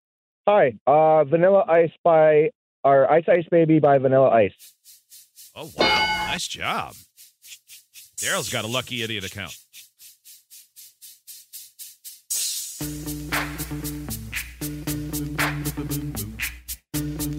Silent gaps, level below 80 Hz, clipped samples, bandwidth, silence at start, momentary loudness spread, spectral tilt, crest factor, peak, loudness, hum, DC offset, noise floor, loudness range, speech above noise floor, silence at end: 0.81-0.86 s, 1.98-2.04 s, 2.55-2.83 s; -46 dBFS; under 0.1%; 16.5 kHz; 0.45 s; 21 LU; -4 dB/octave; 16 dB; -6 dBFS; -21 LUFS; none; under 0.1%; -49 dBFS; 14 LU; 30 dB; 0 s